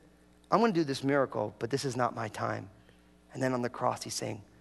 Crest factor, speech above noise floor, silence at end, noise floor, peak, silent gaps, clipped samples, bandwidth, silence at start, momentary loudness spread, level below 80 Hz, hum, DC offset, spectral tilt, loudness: 22 dB; 29 dB; 0.15 s; -60 dBFS; -10 dBFS; none; under 0.1%; 12 kHz; 0.5 s; 10 LU; -66 dBFS; none; under 0.1%; -5 dB/octave; -32 LUFS